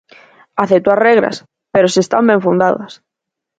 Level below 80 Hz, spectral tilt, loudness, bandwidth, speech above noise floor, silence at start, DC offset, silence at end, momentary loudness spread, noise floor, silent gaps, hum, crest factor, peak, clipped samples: -56 dBFS; -5.5 dB/octave; -13 LUFS; 9.2 kHz; 69 dB; 0.55 s; under 0.1%; 0.65 s; 12 LU; -81 dBFS; none; none; 14 dB; 0 dBFS; under 0.1%